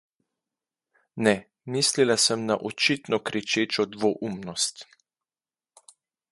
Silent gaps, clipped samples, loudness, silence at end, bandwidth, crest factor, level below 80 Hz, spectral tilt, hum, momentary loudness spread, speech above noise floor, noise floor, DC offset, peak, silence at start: none; under 0.1%; -25 LUFS; 1.5 s; 12 kHz; 22 dB; -68 dBFS; -3 dB/octave; none; 9 LU; over 65 dB; under -90 dBFS; under 0.1%; -6 dBFS; 1.15 s